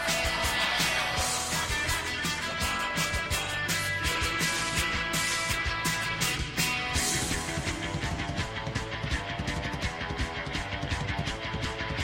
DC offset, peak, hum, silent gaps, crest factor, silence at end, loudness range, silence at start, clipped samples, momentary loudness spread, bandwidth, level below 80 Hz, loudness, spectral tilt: under 0.1%; -12 dBFS; none; none; 18 dB; 0 s; 5 LU; 0 s; under 0.1%; 6 LU; 16.5 kHz; -40 dBFS; -29 LUFS; -2.5 dB/octave